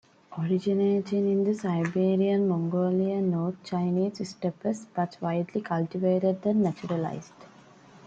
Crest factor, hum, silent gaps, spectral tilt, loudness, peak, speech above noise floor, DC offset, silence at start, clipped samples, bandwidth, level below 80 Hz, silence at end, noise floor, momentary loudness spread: 14 dB; none; none; -8 dB/octave; -27 LUFS; -12 dBFS; 26 dB; under 0.1%; 0.3 s; under 0.1%; 8 kHz; -72 dBFS; 0 s; -53 dBFS; 7 LU